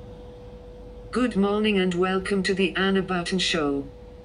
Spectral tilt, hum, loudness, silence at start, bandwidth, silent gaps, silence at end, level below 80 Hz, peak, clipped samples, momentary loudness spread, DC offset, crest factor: -5 dB/octave; none; -24 LUFS; 0 s; 10.5 kHz; none; 0 s; -46 dBFS; -10 dBFS; under 0.1%; 21 LU; under 0.1%; 16 dB